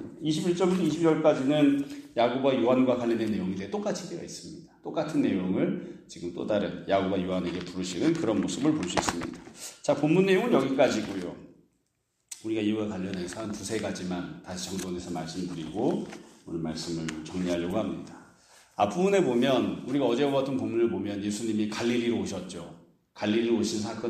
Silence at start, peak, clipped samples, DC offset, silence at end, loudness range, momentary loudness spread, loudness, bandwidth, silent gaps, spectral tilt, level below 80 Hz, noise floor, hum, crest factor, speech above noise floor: 0 s; -6 dBFS; under 0.1%; under 0.1%; 0 s; 8 LU; 15 LU; -28 LUFS; 15 kHz; none; -5.5 dB/octave; -62 dBFS; -76 dBFS; none; 24 dB; 48 dB